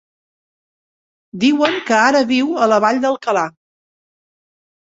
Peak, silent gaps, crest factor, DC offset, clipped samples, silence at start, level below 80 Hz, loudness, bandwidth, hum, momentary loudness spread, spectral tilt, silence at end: -2 dBFS; none; 16 dB; under 0.1%; under 0.1%; 1.35 s; -64 dBFS; -15 LUFS; 8 kHz; none; 7 LU; -4 dB/octave; 1.4 s